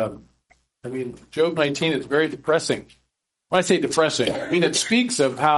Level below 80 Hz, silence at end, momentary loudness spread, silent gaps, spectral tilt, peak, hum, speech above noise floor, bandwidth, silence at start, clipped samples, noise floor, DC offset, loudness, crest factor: -60 dBFS; 0 s; 12 LU; none; -3.5 dB/octave; -4 dBFS; none; 53 dB; 11.5 kHz; 0 s; under 0.1%; -74 dBFS; under 0.1%; -22 LUFS; 18 dB